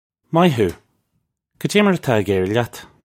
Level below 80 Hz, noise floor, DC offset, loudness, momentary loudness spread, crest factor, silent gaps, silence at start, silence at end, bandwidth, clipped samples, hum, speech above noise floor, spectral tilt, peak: -54 dBFS; -71 dBFS; under 0.1%; -18 LUFS; 7 LU; 18 dB; none; 0.3 s; 0.25 s; 16.5 kHz; under 0.1%; none; 54 dB; -6 dB/octave; 0 dBFS